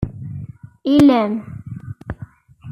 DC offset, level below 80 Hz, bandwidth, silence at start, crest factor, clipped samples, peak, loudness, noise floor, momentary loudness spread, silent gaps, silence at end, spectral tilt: under 0.1%; -44 dBFS; 11 kHz; 0 s; 16 dB; under 0.1%; -4 dBFS; -16 LUFS; -39 dBFS; 21 LU; none; 0 s; -7.5 dB/octave